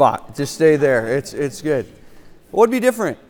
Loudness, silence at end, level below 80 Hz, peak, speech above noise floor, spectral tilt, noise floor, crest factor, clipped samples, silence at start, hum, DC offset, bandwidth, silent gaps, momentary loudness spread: -18 LUFS; 0.15 s; -52 dBFS; 0 dBFS; 24 dB; -5.5 dB/octave; -42 dBFS; 18 dB; under 0.1%; 0 s; none; under 0.1%; 19 kHz; none; 11 LU